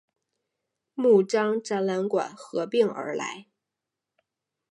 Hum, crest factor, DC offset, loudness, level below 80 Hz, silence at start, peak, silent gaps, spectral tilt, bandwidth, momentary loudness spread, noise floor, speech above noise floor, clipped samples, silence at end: none; 18 dB; under 0.1%; -25 LUFS; -82 dBFS; 0.95 s; -8 dBFS; none; -5.5 dB/octave; 11 kHz; 13 LU; -87 dBFS; 62 dB; under 0.1%; 1.3 s